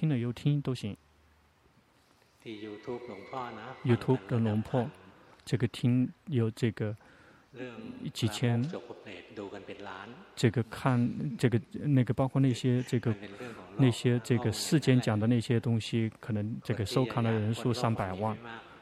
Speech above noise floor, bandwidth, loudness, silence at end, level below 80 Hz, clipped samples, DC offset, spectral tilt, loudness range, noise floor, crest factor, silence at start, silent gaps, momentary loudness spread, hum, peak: 35 dB; 13.5 kHz; -31 LUFS; 0.05 s; -64 dBFS; under 0.1%; under 0.1%; -6.5 dB/octave; 8 LU; -65 dBFS; 20 dB; 0 s; none; 16 LU; none; -12 dBFS